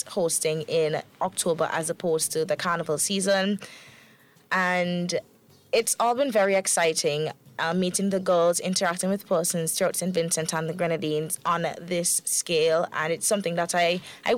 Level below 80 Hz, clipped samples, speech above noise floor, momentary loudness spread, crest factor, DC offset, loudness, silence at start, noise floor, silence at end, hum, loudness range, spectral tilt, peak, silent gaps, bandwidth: -72 dBFS; under 0.1%; 31 dB; 6 LU; 14 dB; under 0.1%; -25 LUFS; 0 s; -56 dBFS; 0 s; none; 2 LU; -3 dB/octave; -12 dBFS; none; 17 kHz